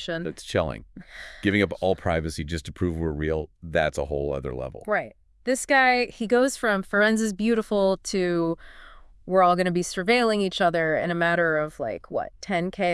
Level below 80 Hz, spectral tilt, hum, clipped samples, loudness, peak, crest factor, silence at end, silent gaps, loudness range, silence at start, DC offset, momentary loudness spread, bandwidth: -46 dBFS; -5 dB/octave; none; under 0.1%; -24 LUFS; -8 dBFS; 18 dB; 0 s; none; 5 LU; 0 s; under 0.1%; 11 LU; 12 kHz